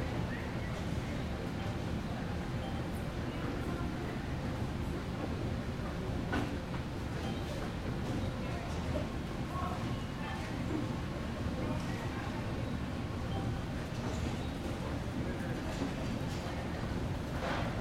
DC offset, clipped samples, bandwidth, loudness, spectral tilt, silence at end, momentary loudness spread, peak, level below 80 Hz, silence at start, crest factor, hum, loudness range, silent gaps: under 0.1%; under 0.1%; 16.5 kHz; -38 LUFS; -6.5 dB/octave; 0 s; 2 LU; -22 dBFS; -46 dBFS; 0 s; 14 dB; none; 1 LU; none